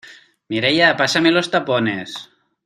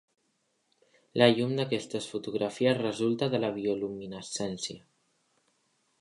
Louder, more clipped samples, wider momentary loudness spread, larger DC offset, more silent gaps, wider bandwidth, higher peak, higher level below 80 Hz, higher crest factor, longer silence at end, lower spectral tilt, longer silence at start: first, -17 LUFS vs -30 LUFS; neither; about the same, 14 LU vs 13 LU; neither; neither; first, 13 kHz vs 11.5 kHz; first, 0 dBFS vs -6 dBFS; first, -60 dBFS vs -70 dBFS; second, 18 dB vs 24 dB; second, 0.4 s vs 1.25 s; about the same, -4 dB/octave vs -5 dB/octave; second, 0.05 s vs 1.15 s